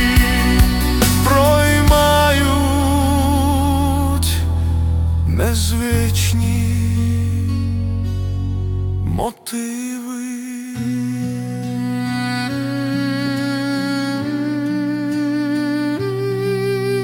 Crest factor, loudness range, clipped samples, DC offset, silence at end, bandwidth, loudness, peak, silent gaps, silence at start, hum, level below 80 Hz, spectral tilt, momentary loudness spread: 16 dB; 9 LU; under 0.1%; under 0.1%; 0 s; 18 kHz; -18 LUFS; -2 dBFS; none; 0 s; none; -26 dBFS; -5.5 dB/octave; 10 LU